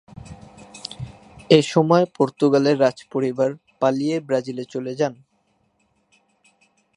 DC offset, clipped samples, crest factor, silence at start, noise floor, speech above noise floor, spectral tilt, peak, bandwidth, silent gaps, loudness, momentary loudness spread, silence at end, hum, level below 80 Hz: under 0.1%; under 0.1%; 22 dB; 0.25 s; -66 dBFS; 47 dB; -6 dB/octave; 0 dBFS; 11 kHz; none; -20 LUFS; 20 LU; 1.85 s; none; -58 dBFS